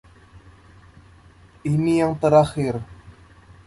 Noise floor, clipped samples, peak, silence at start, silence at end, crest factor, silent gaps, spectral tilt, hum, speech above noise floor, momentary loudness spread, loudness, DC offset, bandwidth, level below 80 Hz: -50 dBFS; under 0.1%; -4 dBFS; 0.35 s; 0.55 s; 20 dB; none; -7.5 dB/octave; none; 31 dB; 15 LU; -20 LUFS; under 0.1%; 11.5 kHz; -50 dBFS